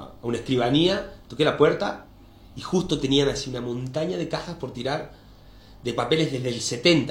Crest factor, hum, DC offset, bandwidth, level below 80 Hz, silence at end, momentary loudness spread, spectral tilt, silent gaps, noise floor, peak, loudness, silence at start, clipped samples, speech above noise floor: 20 dB; none; under 0.1%; 16.5 kHz; -48 dBFS; 0 s; 14 LU; -5 dB/octave; none; -48 dBFS; -4 dBFS; -24 LUFS; 0 s; under 0.1%; 24 dB